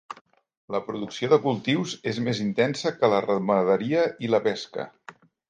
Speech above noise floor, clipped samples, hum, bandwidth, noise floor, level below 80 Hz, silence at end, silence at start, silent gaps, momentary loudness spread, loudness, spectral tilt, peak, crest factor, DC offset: 25 dB; under 0.1%; none; 9.4 kHz; -49 dBFS; -70 dBFS; 0.4 s; 0.1 s; 0.21-0.25 s, 0.57-0.68 s; 12 LU; -25 LUFS; -6 dB/octave; -6 dBFS; 20 dB; under 0.1%